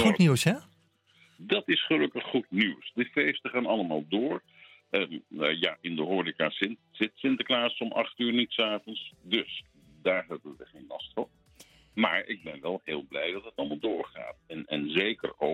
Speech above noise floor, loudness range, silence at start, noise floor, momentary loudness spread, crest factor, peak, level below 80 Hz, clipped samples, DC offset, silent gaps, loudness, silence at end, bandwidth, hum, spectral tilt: 36 dB; 5 LU; 0 s; -65 dBFS; 14 LU; 22 dB; -8 dBFS; -70 dBFS; under 0.1%; under 0.1%; none; -29 LUFS; 0 s; 16 kHz; none; -5 dB/octave